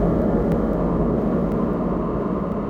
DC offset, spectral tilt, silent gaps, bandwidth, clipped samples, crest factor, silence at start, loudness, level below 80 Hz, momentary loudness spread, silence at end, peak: under 0.1%; -10.5 dB/octave; none; 5.2 kHz; under 0.1%; 14 dB; 0 s; -22 LUFS; -32 dBFS; 4 LU; 0 s; -8 dBFS